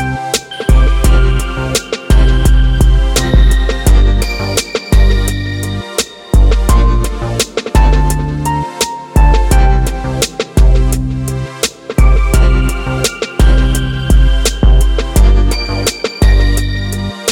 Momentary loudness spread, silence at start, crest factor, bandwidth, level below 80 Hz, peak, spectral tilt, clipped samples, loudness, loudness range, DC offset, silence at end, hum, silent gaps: 6 LU; 0 s; 10 dB; 16.5 kHz; -10 dBFS; 0 dBFS; -5 dB/octave; under 0.1%; -13 LUFS; 2 LU; under 0.1%; 0 s; none; none